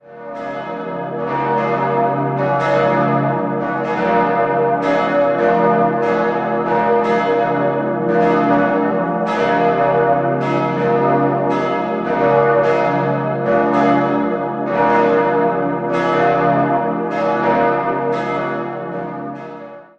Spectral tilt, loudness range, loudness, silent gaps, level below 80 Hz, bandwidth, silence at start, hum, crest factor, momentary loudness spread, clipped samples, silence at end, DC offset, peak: -8 dB/octave; 2 LU; -16 LUFS; none; -54 dBFS; 7.6 kHz; 0.05 s; none; 16 dB; 9 LU; under 0.1%; 0.15 s; under 0.1%; 0 dBFS